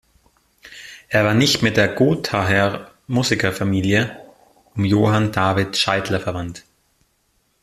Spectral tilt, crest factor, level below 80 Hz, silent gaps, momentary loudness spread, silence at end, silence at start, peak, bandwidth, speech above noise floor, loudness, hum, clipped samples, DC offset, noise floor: -5 dB/octave; 18 dB; -50 dBFS; none; 17 LU; 1.05 s; 0.65 s; -2 dBFS; 14.5 kHz; 47 dB; -18 LUFS; none; under 0.1%; under 0.1%; -65 dBFS